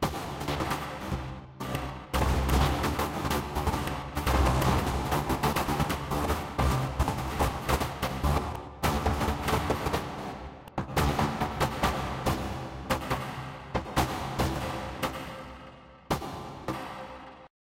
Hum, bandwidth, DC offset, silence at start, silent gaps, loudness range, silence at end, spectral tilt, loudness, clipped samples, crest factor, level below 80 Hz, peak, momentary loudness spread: none; 16.5 kHz; under 0.1%; 0 s; none; 5 LU; 0.3 s; -5.5 dB/octave; -30 LUFS; under 0.1%; 18 dB; -36 dBFS; -12 dBFS; 12 LU